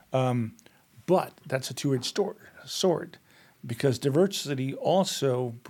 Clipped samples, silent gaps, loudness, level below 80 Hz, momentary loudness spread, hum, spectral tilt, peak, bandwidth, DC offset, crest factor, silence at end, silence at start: under 0.1%; none; -28 LUFS; -74 dBFS; 13 LU; none; -5.5 dB/octave; -12 dBFS; 18.5 kHz; under 0.1%; 18 dB; 0 s; 0.1 s